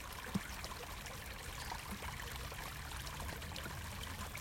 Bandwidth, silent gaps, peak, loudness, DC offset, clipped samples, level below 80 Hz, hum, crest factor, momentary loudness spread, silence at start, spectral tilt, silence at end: 17 kHz; none; -26 dBFS; -45 LUFS; under 0.1%; under 0.1%; -52 dBFS; none; 20 dB; 4 LU; 0 s; -3.5 dB/octave; 0 s